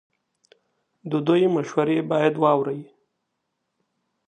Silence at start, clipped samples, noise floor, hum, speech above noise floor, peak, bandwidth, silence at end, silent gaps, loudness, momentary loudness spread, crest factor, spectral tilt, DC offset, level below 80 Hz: 1.05 s; under 0.1%; -78 dBFS; none; 57 dB; -4 dBFS; 9.2 kHz; 1.45 s; none; -22 LUFS; 10 LU; 20 dB; -7.5 dB/octave; under 0.1%; -74 dBFS